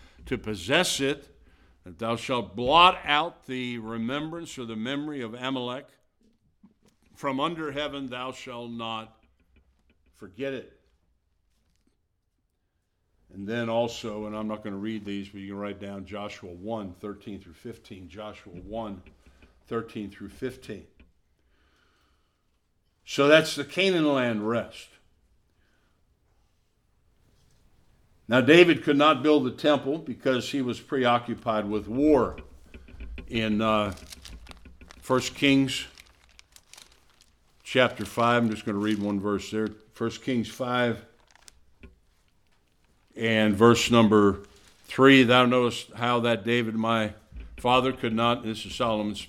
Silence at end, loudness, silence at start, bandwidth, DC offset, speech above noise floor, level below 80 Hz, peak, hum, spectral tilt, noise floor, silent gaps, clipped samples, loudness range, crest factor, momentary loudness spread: 0 s; -25 LUFS; 0.2 s; 15.5 kHz; under 0.1%; 50 dB; -54 dBFS; -2 dBFS; none; -5 dB/octave; -75 dBFS; none; under 0.1%; 17 LU; 24 dB; 20 LU